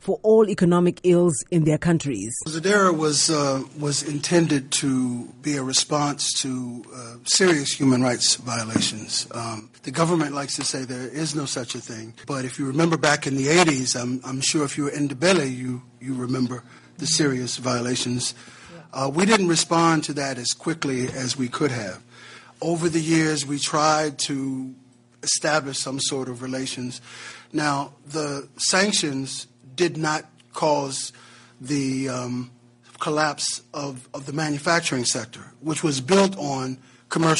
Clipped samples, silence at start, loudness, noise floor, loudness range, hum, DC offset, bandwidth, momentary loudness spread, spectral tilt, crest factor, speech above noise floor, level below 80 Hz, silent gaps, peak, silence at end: under 0.1%; 0.05 s; -23 LUFS; -46 dBFS; 5 LU; none; under 0.1%; 11.5 kHz; 14 LU; -4 dB/octave; 20 dB; 23 dB; -60 dBFS; none; -2 dBFS; 0 s